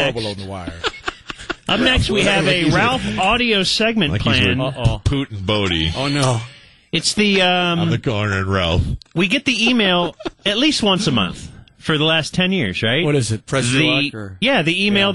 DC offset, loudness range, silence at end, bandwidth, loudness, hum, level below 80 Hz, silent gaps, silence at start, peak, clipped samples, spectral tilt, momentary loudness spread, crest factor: 0.1%; 2 LU; 0 s; 11.5 kHz; -17 LUFS; none; -36 dBFS; none; 0 s; -4 dBFS; under 0.1%; -4.5 dB/octave; 10 LU; 14 dB